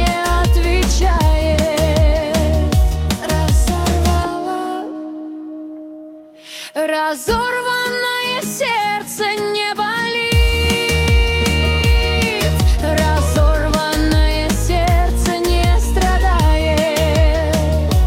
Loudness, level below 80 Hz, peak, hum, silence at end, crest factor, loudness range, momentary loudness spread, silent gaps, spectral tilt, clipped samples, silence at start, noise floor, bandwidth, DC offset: -16 LUFS; -18 dBFS; -2 dBFS; none; 0 s; 14 dB; 6 LU; 8 LU; none; -5 dB/octave; under 0.1%; 0 s; -37 dBFS; 16.5 kHz; under 0.1%